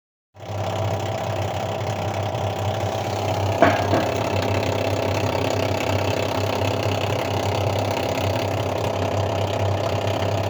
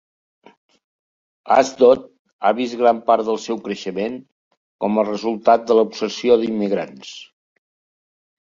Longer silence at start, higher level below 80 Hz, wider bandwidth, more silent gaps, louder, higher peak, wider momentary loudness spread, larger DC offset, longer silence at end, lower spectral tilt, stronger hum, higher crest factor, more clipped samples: second, 0.35 s vs 1.45 s; first, -50 dBFS vs -64 dBFS; first, over 20 kHz vs 7.6 kHz; second, none vs 2.19-2.25 s, 2.33-2.39 s, 4.32-4.51 s, 4.57-4.79 s; second, -23 LUFS vs -18 LUFS; about the same, 0 dBFS vs -2 dBFS; second, 4 LU vs 12 LU; neither; second, 0 s vs 1.2 s; about the same, -5.5 dB/octave vs -5 dB/octave; neither; about the same, 22 dB vs 18 dB; neither